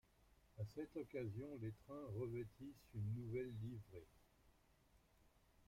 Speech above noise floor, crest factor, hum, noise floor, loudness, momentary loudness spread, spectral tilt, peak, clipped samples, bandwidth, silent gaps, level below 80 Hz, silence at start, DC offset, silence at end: 25 dB; 16 dB; none; -75 dBFS; -51 LUFS; 10 LU; -8.5 dB/octave; -36 dBFS; under 0.1%; 16 kHz; none; -72 dBFS; 0.3 s; under 0.1%; 0.05 s